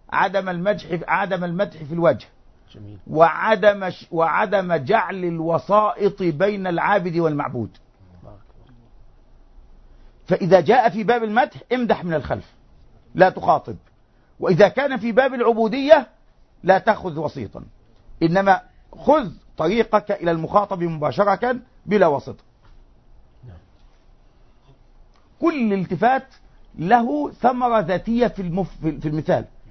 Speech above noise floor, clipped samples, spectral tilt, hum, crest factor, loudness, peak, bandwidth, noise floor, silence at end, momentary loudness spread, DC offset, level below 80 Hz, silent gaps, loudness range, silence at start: 35 dB; under 0.1%; -7.5 dB/octave; none; 20 dB; -20 LUFS; 0 dBFS; 6.4 kHz; -54 dBFS; 0.05 s; 11 LU; under 0.1%; -48 dBFS; none; 6 LU; 0.1 s